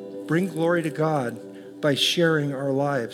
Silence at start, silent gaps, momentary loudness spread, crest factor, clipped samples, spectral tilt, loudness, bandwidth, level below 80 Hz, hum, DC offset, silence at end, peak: 0 s; none; 9 LU; 14 dB; under 0.1%; -5 dB/octave; -23 LUFS; 17 kHz; -78 dBFS; none; under 0.1%; 0 s; -10 dBFS